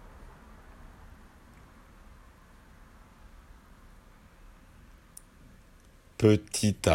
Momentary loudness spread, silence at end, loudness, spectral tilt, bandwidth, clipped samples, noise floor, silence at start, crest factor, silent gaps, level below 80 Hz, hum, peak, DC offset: 31 LU; 0 s; -26 LUFS; -5.5 dB/octave; 16 kHz; under 0.1%; -57 dBFS; 0.2 s; 26 dB; none; -54 dBFS; none; -8 dBFS; under 0.1%